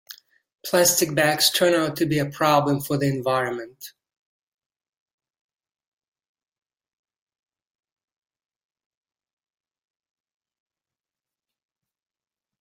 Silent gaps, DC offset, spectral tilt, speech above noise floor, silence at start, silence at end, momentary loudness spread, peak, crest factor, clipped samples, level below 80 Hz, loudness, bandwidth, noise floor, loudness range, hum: none; under 0.1%; -3.5 dB/octave; over 69 dB; 0.1 s; 8.7 s; 10 LU; -4 dBFS; 24 dB; under 0.1%; -66 dBFS; -21 LUFS; 16.5 kHz; under -90 dBFS; 12 LU; none